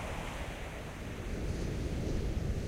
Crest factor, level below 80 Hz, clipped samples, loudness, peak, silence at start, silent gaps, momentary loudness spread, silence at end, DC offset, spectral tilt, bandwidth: 14 dB; -40 dBFS; under 0.1%; -39 LUFS; -22 dBFS; 0 s; none; 6 LU; 0 s; under 0.1%; -6 dB/octave; 16 kHz